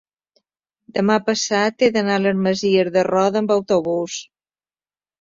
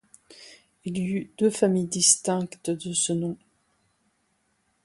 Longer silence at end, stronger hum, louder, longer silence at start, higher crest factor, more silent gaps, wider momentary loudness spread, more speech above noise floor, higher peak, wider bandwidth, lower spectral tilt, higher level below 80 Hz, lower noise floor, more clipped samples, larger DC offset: second, 1 s vs 1.5 s; neither; first, -19 LUFS vs -24 LUFS; first, 0.95 s vs 0.3 s; second, 16 dB vs 22 dB; neither; second, 7 LU vs 15 LU; first, over 72 dB vs 46 dB; about the same, -4 dBFS vs -6 dBFS; second, 7.6 kHz vs 11.5 kHz; about the same, -4.5 dB/octave vs -3.5 dB/octave; first, -62 dBFS vs -68 dBFS; first, under -90 dBFS vs -71 dBFS; neither; neither